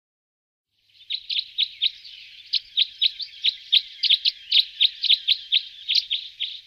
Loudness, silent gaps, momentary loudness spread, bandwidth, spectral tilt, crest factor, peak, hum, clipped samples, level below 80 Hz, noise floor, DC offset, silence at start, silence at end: -21 LUFS; none; 11 LU; 15 kHz; 4.5 dB/octave; 20 dB; -6 dBFS; none; under 0.1%; -72 dBFS; -44 dBFS; under 0.1%; 1.1 s; 0.05 s